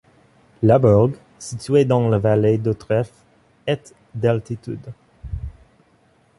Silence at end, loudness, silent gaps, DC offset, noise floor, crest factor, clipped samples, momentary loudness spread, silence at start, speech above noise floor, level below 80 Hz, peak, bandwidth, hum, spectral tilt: 0.9 s; -19 LUFS; none; under 0.1%; -58 dBFS; 18 dB; under 0.1%; 19 LU; 0.6 s; 40 dB; -42 dBFS; -2 dBFS; 11.5 kHz; none; -8 dB/octave